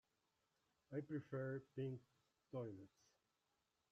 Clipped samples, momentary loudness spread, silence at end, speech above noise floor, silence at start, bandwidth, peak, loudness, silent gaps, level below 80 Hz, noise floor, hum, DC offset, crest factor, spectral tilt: under 0.1%; 10 LU; 1.05 s; 38 dB; 0.9 s; 7.8 kHz; -36 dBFS; -51 LUFS; none; -88 dBFS; -88 dBFS; none; under 0.1%; 18 dB; -8.5 dB/octave